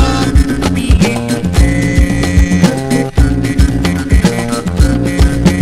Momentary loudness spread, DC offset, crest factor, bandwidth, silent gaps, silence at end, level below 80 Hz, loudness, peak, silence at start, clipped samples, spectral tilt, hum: 4 LU; under 0.1%; 10 dB; 14 kHz; none; 0 s; -14 dBFS; -12 LUFS; 0 dBFS; 0 s; 1%; -6 dB/octave; none